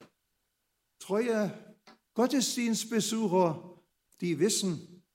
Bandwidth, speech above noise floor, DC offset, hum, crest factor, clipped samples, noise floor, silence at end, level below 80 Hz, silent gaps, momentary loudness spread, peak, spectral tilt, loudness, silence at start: 16 kHz; 51 dB; under 0.1%; none; 18 dB; under 0.1%; -80 dBFS; 0.2 s; -82 dBFS; none; 12 LU; -14 dBFS; -4 dB/octave; -30 LUFS; 0 s